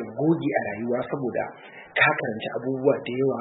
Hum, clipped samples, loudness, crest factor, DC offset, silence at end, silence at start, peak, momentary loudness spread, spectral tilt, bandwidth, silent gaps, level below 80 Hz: none; under 0.1%; -25 LUFS; 18 dB; under 0.1%; 0 s; 0 s; -8 dBFS; 9 LU; -10.5 dB/octave; 4.1 kHz; none; -68 dBFS